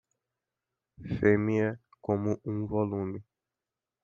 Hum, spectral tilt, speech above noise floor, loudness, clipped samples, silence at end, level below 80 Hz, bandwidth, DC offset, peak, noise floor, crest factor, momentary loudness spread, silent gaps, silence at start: none; -9.5 dB/octave; over 61 dB; -30 LUFS; under 0.1%; 0.8 s; -60 dBFS; 7 kHz; under 0.1%; -10 dBFS; under -90 dBFS; 22 dB; 14 LU; none; 1 s